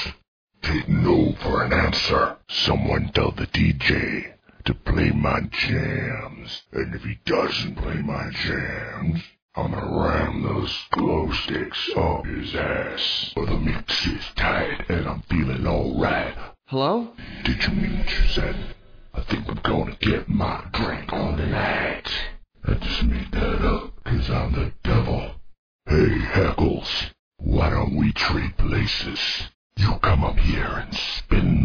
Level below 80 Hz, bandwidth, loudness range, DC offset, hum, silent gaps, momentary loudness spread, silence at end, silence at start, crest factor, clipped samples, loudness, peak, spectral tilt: -30 dBFS; 5.4 kHz; 4 LU; under 0.1%; none; 0.28-0.47 s, 9.42-9.49 s, 25.58-25.79 s, 27.19-27.31 s, 29.54-29.70 s; 9 LU; 0 s; 0 s; 20 dB; under 0.1%; -24 LUFS; -4 dBFS; -6.5 dB/octave